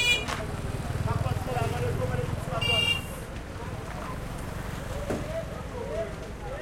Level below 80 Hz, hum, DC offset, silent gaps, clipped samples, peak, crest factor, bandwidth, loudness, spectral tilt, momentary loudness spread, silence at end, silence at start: -40 dBFS; none; under 0.1%; none; under 0.1%; -10 dBFS; 20 dB; 16.5 kHz; -30 LUFS; -4.5 dB/octave; 13 LU; 0 s; 0 s